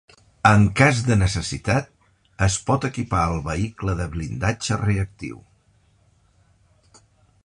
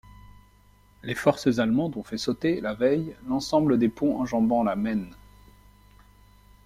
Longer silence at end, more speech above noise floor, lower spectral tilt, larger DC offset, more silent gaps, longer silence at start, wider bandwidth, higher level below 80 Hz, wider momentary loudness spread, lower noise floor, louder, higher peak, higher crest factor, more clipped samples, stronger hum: first, 2.05 s vs 1.5 s; first, 39 dB vs 33 dB; about the same, -5.5 dB/octave vs -6.5 dB/octave; neither; neither; second, 0.45 s vs 1.05 s; second, 11 kHz vs 14.5 kHz; first, -38 dBFS vs -54 dBFS; first, 11 LU vs 8 LU; about the same, -60 dBFS vs -57 dBFS; first, -21 LUFS vs -25 LUFS; first, -2 dBFS vs -6 dBFS; about the same, 20 dB vs 20 dB; neither; second, none vs 50 Hz at -55 dBFS